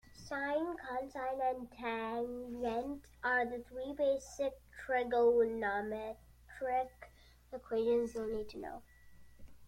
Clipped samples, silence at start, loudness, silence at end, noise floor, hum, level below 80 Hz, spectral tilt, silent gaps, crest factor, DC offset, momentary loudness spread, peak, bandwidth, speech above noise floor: under 0.1%; 0.1 s; -37 LUFS; 0 s; -59 dBFS; none; -62 dBFS; -5 dB/octave; none; 16 dB; under 0.1%; 14 LU; -20 dBFS; 16 kHz; 22 dB